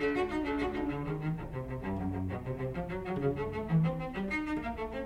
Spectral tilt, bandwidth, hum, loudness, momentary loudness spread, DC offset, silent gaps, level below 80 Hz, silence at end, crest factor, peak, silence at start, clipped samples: -8.5 dB/octave; 10.5 kHz; none; -35 LUFS; 7 LU; under 0.1%; none; -48 dBFS; 0 s; 16 dB; -18 dBFS; 0 s; under 0.1%